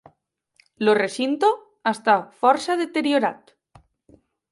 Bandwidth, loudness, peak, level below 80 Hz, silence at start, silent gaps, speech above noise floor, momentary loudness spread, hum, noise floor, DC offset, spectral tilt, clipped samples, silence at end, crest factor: 11.5 kHz; -21 LUFS; -4 dBFS; -70 dBFS; 0.8 s; none; 48 dB; 5 LU; none; -69 dBFS; under 0.1%; -4.5 dB/octave; under 0.1%; 1.15 s; 20 dB